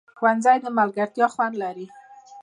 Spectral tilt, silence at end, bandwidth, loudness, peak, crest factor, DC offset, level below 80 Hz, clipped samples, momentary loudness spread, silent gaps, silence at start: -5.5 dB/octave; 0 s; 10.5 kHz; -22 LUFS; -4 dBFS; 18 dB; under 0.1%; -80 dBFS; under 0.1%; 14 LU; none; 0.2 s